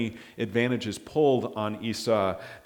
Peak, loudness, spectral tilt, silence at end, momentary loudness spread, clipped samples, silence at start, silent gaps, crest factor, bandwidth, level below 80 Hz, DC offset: -10 dBFS; -27 LUFS; -5.5 dB/octave; 0.05 s; 8 LU; under 0.1%; 0 s; none; 18 dB; 18.5 kHz; -62 dBFS; under 0.1%